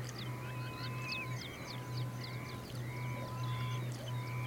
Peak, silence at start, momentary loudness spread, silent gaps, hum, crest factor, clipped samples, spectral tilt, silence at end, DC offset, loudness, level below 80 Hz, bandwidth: -28 dBFS; 0 s; 4 LU; none; none; 14 dB; under 0.1%; -5 dB/octave; 0 s; under 0.1%; -41 LUFS; -62 dBFS; 17 kHz